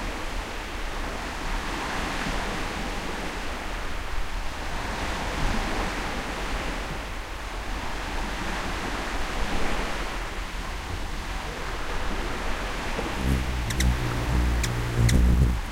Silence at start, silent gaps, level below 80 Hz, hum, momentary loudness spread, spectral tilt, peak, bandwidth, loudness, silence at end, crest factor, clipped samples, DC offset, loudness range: 0 s; none; -30 dBFS; none; 8 LU; -4.5 dB/octave; -8 dBFS; 16 kHz; -29 LUFS; 0 s; 18 dB; under 0.1%; under 0.1%; 4 LU